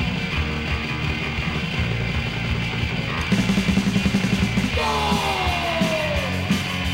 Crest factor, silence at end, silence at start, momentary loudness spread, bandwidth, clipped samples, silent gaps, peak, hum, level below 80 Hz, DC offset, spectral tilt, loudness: 14 dB; 0 s; 0 s; 4 LU; 16.5 kHz; under 0.1%; none; -8 dBFS; none; -32 dBFS; under 0.1%; -5 dB/octave; -22 LUFS